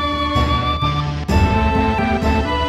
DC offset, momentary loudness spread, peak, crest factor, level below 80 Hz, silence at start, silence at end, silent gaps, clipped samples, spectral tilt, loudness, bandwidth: under 0.1%; 3 LU; -2 dBFS; 14 dB; -24 dBFS; 0 s; 0 s; none; under 0.1%; -6.5 dB/octave; -17 LUFS; 12.5 kHz